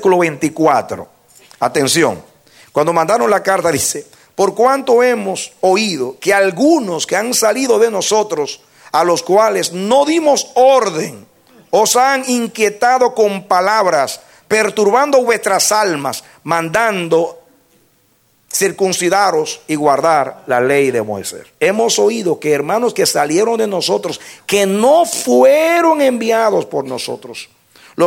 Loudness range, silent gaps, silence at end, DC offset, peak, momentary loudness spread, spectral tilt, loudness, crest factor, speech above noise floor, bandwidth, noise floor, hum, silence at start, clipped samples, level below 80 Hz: 3 LU; none; 0 s; under 0.1%; 0 dBFS; 10 LU; -3 dB/octave; -14 LUFS; 14 dB; 43 dB; 17 kHz; -56 dBFS; none; 0 s; under 0.1%; -60 dBFS